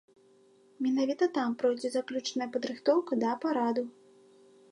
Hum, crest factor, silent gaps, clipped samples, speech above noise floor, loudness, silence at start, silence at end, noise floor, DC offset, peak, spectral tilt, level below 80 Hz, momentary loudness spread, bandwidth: none; 18 dB; none; under 0.1%; 32 dB; -30 LUFS; 0.8 s; 0.8 s; -62 dBFS; under 0.1%; -14 dBFS; -4.5 dB/octave; -86 dBFS; 6 LU; 11.5 kHz